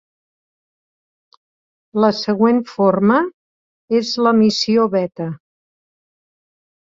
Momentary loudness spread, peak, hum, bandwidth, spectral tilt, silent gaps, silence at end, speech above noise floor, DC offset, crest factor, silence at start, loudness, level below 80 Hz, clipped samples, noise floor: 12 LU; -2 dBFS; none; 7.6 kHz; -6 dB/octave; 3.33-3.88 s; 1.5 s; over 75 dB; under 0.1%; 18 dB; 1.95 s; -16 LUFS; -64 dBFS; under 0.1%; under -90 dBFS